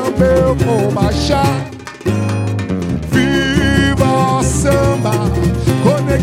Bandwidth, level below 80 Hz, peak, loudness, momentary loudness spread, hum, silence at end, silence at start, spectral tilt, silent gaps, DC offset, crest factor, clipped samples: 16.5 kHz; -28 dBFS; -2 dBFS; -14 LUFS; 6 LU; none; 0 s; 0 s; -6 dB/octave; none; under 0.1%; 12 dB; under 0.1%